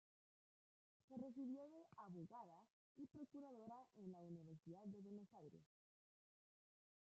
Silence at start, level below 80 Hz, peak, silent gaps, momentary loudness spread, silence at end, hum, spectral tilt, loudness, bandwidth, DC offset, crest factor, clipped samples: 1.1 s; under -90 dBFS; -44 dBFS; 2.70-2.95 s; 9 LU; 1.5 s; none; -9 dB/octave; -59 LUFS; 7.6 kHz; under 0.1%; 16 dB; under 0.1%